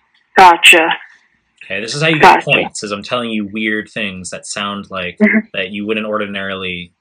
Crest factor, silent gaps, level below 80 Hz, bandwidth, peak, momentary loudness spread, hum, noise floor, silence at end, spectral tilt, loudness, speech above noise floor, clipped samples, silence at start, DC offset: 14 dB; none; -52 dBFS; 19.5 kHz; 0 dBFS; 16 LU; none; -52 dBFS; 0.15 s; -3.5 dB/octave; -12 LUFS; 38 dB; 0.7%; 0.35 s; under 0.1%